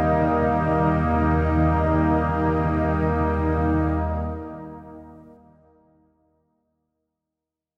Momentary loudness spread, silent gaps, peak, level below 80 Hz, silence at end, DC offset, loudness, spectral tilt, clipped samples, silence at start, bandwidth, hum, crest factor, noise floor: 14 LU; none; -10 dBFS; -32 dBFS; 2.55 s; under 0.1%; -22 LUFS; -10 dB/octave; under 0.1%; 0 s; 5.6 kHz; none; 14 dB; -86 dBFS